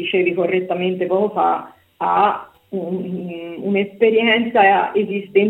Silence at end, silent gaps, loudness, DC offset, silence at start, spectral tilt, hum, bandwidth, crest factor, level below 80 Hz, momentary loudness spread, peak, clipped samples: 0 s; none; -18 LUFS; under 0.1%; 0 s; -8 dB/octave; none; 4.1 kHz; 16 dB; -66 dBFS; 13 LU; -2 dBFS; under 0.1%